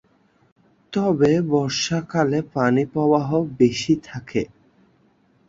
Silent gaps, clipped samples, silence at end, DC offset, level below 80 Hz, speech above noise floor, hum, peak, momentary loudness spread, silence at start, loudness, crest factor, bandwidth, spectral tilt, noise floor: none; under 0.1%; 1.05 s; under 0.1%; -56 dBFS; 40 dB; none; -4 dBFS; 9 LU; 0.9 s; -21 LUFS; 18 dB; 7.8 kHz; -6 dB/octave; -60 dBFS